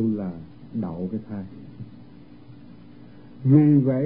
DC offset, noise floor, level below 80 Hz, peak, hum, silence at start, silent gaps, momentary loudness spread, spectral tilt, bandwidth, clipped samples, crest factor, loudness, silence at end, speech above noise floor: 0.3%; -47 dBFS; -58 dBFS; -4 dBFS; none; 0 s; none; 25 LU; -14 dB/octave; 4.7 kHz; under 0.1%; 20 dB; -22 LUFS; 0 s; 25 dB